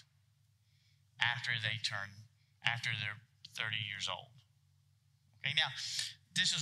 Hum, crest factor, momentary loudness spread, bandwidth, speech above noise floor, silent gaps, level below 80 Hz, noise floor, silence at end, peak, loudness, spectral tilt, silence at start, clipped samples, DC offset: none; 28 dB; 10 LU; 15 kHz; 34 dB; none; -90 dBFS; -72 dBFS; 0 s; -12 dBFS; -36 LUFS; -1.5 dB/octave; 1.2 s; under 0.1%; under 0.1%